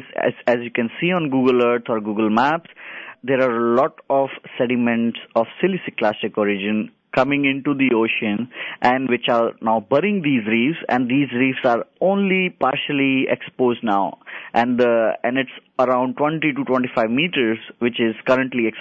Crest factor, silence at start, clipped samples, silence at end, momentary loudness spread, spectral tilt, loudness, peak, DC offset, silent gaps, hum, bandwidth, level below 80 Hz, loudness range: 16 dB; 0 s; under 0.1%; 0 s; 6 LU; -7.5 dB/octave; -20 LUFS; -4 dBFS; under 0.1%; none; none; 7.2 kHz; -64 dBFS; 2 LU